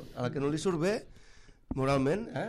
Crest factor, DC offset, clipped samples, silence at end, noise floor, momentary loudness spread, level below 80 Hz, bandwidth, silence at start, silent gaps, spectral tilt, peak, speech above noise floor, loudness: 16 dB; under 0.1%; under 0.1%; 0 s; -55 dBFS; 8 LU; -54 dBFS; 13.5 kHz; 0 s; none; -6.5 dB/octave; -16 dBFS; 24 dB; -31 LUFS